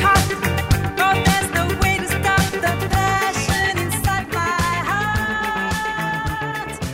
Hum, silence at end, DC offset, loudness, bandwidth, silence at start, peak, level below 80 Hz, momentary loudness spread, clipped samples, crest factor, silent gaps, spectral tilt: none; 0 s; under 0.1%; -19 LUFS; 16.5 kHz; 0 s; -6 dBFS; -32 dBFS; 5 LU; under 0.1%; 14 dB; none; -4 dB/octave